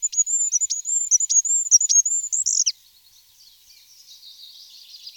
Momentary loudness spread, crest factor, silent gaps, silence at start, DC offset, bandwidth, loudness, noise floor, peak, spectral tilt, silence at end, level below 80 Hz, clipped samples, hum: 7 LU; 18 dB; none; 0 s; under 0.1%; 19 kHz; -17 LUFS; -54 dBFS; -4 dBFS; 7 dB/octave; 0.05 s; -74 dBFS; under 0.1%; none